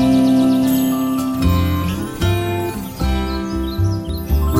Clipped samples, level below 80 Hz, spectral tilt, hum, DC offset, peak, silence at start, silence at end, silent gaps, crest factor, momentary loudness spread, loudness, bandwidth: under 0.1%; -26 dBFS; -6.5 dB/octave; none; under 0.1%; -2 dBFS; 0 s; 0 s; none; 14 dB; 9 LU; -18 LUFS; 16.5 kHz